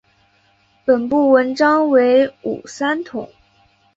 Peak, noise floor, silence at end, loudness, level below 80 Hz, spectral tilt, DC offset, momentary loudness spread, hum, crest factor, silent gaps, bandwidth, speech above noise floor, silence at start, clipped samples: -2 dBFS; -58 dBFS; 0.7 s; -16 LUFS; -60 dBFS; -5 dB/octave; under 0.1%; 14 LU; none; 16 dB; none; 7.8 kHz; 42 dB; 0.85 s; under 0.1%